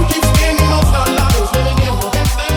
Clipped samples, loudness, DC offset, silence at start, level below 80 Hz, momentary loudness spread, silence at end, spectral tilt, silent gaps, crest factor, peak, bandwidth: under 0.1%; -14 LUFS; under 0.1%; 0 s; -16 dBFS; 4 LU; 0 s; -5 dB/octave; none; 10 dB; -2 dBFS; 19.5 kHz